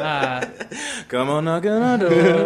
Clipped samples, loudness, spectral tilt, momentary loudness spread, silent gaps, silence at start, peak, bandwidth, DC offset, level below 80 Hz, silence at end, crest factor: under 0.1%; -20 LUFS; -5.5 dB/octave; 13 LU; none; 0 s; -4 dBFS; 12 kHz; under 0.1%; -58 dBFS; 0 s; 16 dB